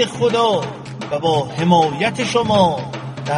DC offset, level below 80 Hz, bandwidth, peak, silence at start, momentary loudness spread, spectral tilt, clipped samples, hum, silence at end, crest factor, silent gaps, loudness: under 0.1%; -52 dBFS; 11.5 kHz; -2 dBFS; 0 s; 13 LU; -5.5 dB/octave; under 0.1%; none; 0 s; 14 dB; none; -17 LUFS